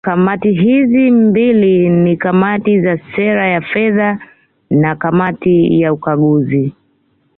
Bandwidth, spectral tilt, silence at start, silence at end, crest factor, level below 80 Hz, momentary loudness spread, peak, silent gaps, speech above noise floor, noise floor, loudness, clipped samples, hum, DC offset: 4 kHz; -12 dB/octave; 0.05 s; 0.65 s; 10 dB; -50 dBFS; 6 LU; -2 dBFS; none; 46 dB; -57 dBFS; -12 LUFS; under 0.1%; none; under 0.1%